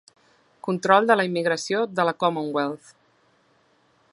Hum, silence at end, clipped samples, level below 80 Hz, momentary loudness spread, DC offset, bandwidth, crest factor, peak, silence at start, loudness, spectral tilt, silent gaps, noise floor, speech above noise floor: none; 1.35 s; under 0.1%; -76 dBFS; 12 LU; under 0.1%; 11.5 kHz; 22 dB; -2 dBFS; 0.65 s; -22 LUFS; -5 dB/octave; none; -63 dBFS; 41 dB